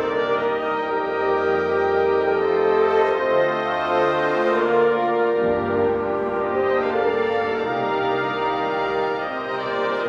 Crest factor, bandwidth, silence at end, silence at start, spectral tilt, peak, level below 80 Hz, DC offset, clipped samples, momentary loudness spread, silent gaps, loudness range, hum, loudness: 14 dB; 7 kHz; 0 s; 0 s; -6.5 dB/octave; -6 dBFS; -54 dBFS; under 0.1%; under 0.1%; 5 LU; none; 3 LU; none; -21 LUFS